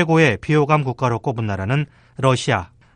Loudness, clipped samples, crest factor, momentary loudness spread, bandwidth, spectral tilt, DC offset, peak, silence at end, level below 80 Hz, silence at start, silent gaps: -19 LUFS; under 0.1%; 18 dB; 8 LU; 9.8 kHz; -6.5 dB/octave; under 0.1%; -2 dBFS; 0.3 s; -52 dBFS; 0 s; none